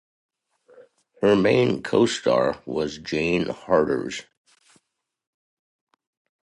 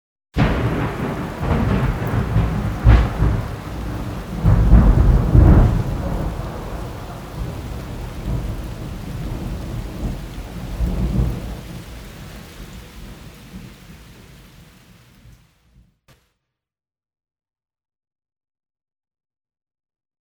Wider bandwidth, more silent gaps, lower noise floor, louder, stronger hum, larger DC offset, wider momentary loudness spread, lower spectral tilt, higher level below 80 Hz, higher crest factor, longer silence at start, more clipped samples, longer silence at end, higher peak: second, 11.5 kHz vs 19 kHz; neither; second, -74 dBFS vs -88 dBFS; about the same, -22 LUFS vs -20 LUFS; neither; neither; second, 9 LU vs 23 LU; second, -5.5 dB/octave vs -8 dB/octave; second, -56 dBFS vs -24 dBFS; about the same, 20 dB vs 20 dB; first, 1.2 s vs 0.35 s; neither; second, 2.2 s vs 4.9 s; second, -6 dBFS vs 0 dBFS